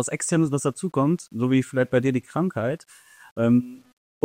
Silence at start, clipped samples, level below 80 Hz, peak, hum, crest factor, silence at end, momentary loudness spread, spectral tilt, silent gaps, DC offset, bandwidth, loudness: 0 s; under 0.1%; -64 dBFS; -6 dBFS; none; 16 dB; 0.5 s; 8 LU; -6 dB/octave; 3.31-3.36 s; under 0.1%; 15.5 kHz; -23 LUFS